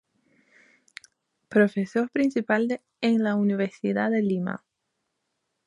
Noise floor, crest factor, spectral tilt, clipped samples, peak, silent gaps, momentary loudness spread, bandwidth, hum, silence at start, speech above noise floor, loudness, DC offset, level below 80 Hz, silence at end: -79 dBFS; 20 dB; -7.5 dB/octave; under 0.1%; -8 dBFS; none; 6 LU; 10.5 kHz; none; 1.5 s; 55 dB; -25 LUFS; under 0.1%; -74 dBFS; 1.1 s